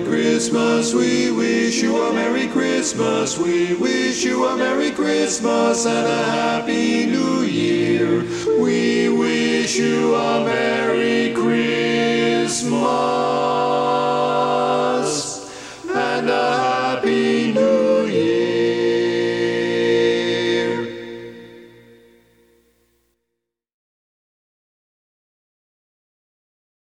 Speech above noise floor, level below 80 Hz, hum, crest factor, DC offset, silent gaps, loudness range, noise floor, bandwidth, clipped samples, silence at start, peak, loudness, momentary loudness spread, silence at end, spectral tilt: 61 dB; -58 dBFS; none; 14 dB; under 0.1%; none; 2 LU; -79 dBFS; 12 kHz; under 0.1%; 0 s; -4 dBFS; -18 LUFS; 3 LU; 5.25 s; -4 dB/octave